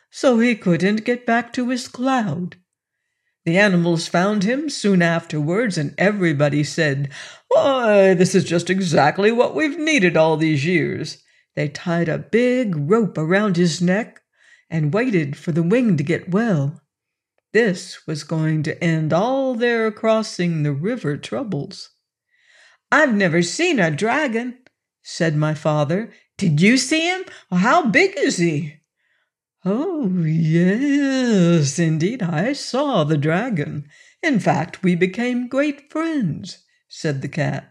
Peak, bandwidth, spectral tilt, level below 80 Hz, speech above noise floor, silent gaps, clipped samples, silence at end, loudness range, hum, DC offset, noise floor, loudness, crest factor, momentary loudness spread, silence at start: -4 dBFS; 11 kHz; -6 dB/octave; -66 dBFS; 64 dB; none; under 0.1%; 0.1 s; 4 LU; none; under 0.1%; -83 dBFS; -19 LUFS; 16 dB; 10 LU; 0.15 s